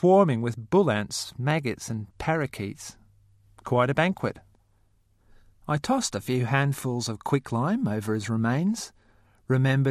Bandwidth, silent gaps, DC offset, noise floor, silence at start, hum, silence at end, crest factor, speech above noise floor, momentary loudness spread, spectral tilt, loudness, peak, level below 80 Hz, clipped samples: 14 kHz; none; under 0.1%; -64 dBFS; 0 s; none; 0 s; 18 dB; 39 dB; 12 LU; -6 dB/octave; -26 LUFS; -8 dBFS; -58 dBFS; under 0.1%